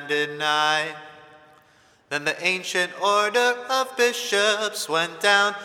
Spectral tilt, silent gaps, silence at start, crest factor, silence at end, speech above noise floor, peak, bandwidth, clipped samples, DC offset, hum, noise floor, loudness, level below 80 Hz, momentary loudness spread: -1.5 dB/octave; none; 0 s; 20 dB; 0 s; 35 dB; -4 dBFS; 17.5 kHz; under 0.1%; under 0.1%; none; -57 dBFS; -22 LUFS; -76 dBFS; 6 LU